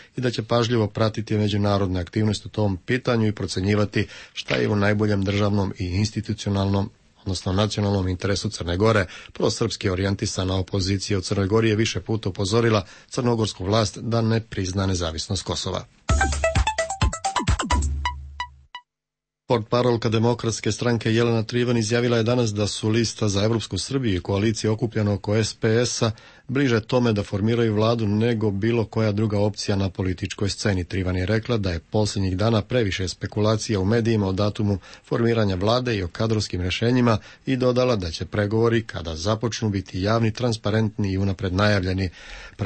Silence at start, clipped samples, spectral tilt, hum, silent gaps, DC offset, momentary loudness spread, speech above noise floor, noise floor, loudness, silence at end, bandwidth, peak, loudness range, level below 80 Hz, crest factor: 0 s; under 0.1%; -5.5 dB/octave; none; none; under 0.1%; 6 LU; 65 dB; -87 dBFS; -23 LUFS; 0 s; 8.8 kHz; -8 dBFS; 2 LU; -38 dBFS; 16 dB